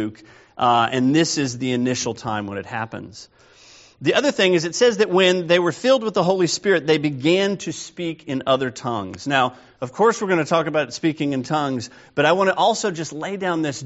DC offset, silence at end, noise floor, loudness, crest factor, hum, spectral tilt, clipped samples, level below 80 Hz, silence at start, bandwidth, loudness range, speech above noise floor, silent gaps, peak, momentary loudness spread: under 0.1%; 0 s; -49 dBFS; -20 LUFS; 18 dB; none; -3.5 dB/octave; under 0.1%; -62 dBFS; 0 s; 8 kHz; 5 LU; 28 dB; none; -2 dBFS; 12 LU